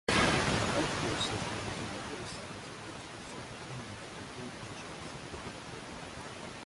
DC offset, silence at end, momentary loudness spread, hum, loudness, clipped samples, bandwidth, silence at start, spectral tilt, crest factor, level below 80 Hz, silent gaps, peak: under 0.1%; 0 s; 14 LU; none; -36 LUFS; under 0.1%; 11.5 kHz; 0.1 s; -3.5 dB/octave; 22 dB; -52 dBFS; none; -14 dBFS